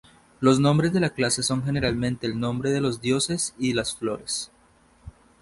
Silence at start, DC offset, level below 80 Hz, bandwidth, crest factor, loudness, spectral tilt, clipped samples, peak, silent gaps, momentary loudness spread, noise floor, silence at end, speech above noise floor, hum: 0.4 s; under 0.1%; -50 dBFS; 11.5 kHz; 20 dB; -24 LUFS; -4.5 dB/octave; under 0.1%; -6 dBFS; none; 9 LU; -58 dBFS; 0.3 s; 34 dB; none